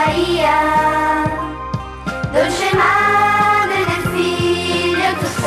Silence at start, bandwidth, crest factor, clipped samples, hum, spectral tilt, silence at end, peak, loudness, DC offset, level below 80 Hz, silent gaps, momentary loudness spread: 0 s; 15 kHz; 14 dB; under 0.1%; none; -4.5 dB/octave; 0 s; -2 dBFS; -15 LUFS; under 0.1%; -38 dBFS; none; 11 LU